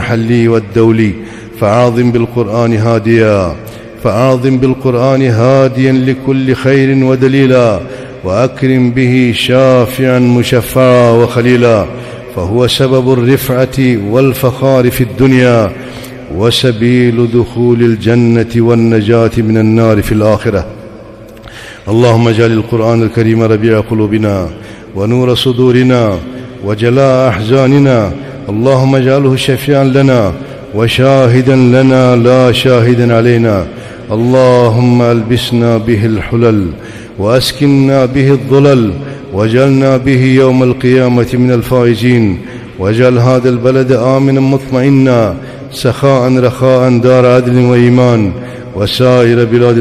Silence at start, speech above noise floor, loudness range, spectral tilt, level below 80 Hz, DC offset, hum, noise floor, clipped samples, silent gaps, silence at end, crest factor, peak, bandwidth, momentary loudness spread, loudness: 0 s; 23 dB; 3 LU; -7 dB/octave; -36 dBFS; under 0.1%; none; -30 dBFS; 1%; none; 0 s; 8 dB; 0 dBFS; 15 kHz; 10 LU; -9 LUFS